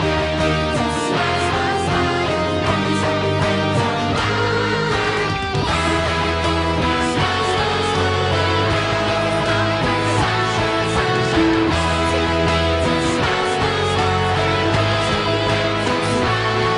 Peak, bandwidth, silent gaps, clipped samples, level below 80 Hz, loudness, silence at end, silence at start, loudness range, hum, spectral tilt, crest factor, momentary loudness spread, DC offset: -6 dBFS; 10.5 kHz; none; under 0.1%; -34 dBFS; -18 LUFS; 0 s; 0 s; 1 LU; none; -5 dB/octave; 12 dB; 2 LU; under 0.1%